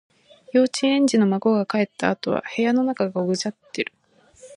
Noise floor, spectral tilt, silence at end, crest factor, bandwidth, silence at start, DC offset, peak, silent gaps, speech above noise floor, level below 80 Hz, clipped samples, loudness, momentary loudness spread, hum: -50 dBFS; -5 dB/octave; 0 s; 18 dB; 11 kHz; 0.55 s; under 0.1%; -4 dBFS; none; 29 dB; -68 dBFS; under 0.1%; -22 LUFS; 11 LU; none